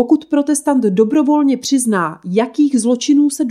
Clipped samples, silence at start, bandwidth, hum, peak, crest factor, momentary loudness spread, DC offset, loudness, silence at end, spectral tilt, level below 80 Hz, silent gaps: under 0.1%; 0 s; 14 kHz; none; -2 dBFS; 12 dB; 5 LU; under 0.1%; -14 LUFS; 0 s; -5 dB/octave; -66 dBFS; none